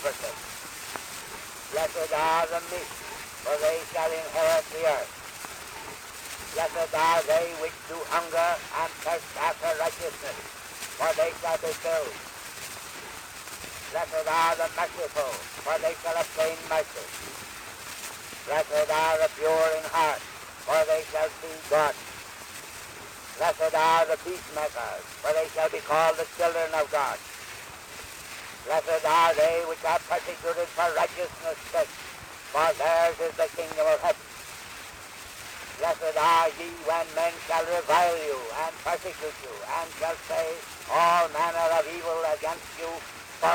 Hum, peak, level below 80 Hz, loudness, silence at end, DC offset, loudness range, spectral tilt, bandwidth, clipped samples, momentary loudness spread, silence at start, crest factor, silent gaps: none; -8 dBFS; -60 dBFS; -27 LUFS; 0 s; under 0.1%; 4 LU; -2 dB/octave; over 20 kHz; under 0.1%; 15 LU; 0 s; 20 dB; none